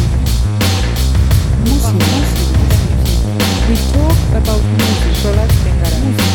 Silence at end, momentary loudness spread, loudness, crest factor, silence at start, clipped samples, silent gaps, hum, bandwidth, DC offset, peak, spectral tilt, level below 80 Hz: 0 s; 2 LU; -13 LUFS; 10 dB; 0 s; under 0.1%; none; none; 18.5 kHz; under 0.1%; 0 dBFS; -5.5 dB/octave; -14 dBFS